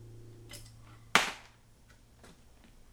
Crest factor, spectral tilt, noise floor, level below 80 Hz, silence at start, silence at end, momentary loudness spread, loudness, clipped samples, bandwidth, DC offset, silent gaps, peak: 32 dB; -1.5 dB/octave; -60 dBFS; -60 dBFS; 0 s; 1.55 s; 26 LU; -29 LUFS; under 0.1%; over 20 kHz; under 0.1%; none; -8 dBFS